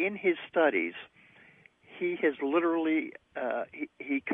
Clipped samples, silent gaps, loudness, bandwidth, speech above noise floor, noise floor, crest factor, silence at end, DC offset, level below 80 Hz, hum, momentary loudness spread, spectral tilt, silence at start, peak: under 0.1%; none; -30 LUFS; 3.8 kHz; 29 dB; -59 dBFS; 18 dB; 0 s; under 0.1%; -76 dBFS; none; 12 LU; -7.5 dB/octave; 0 s; -12 dBFS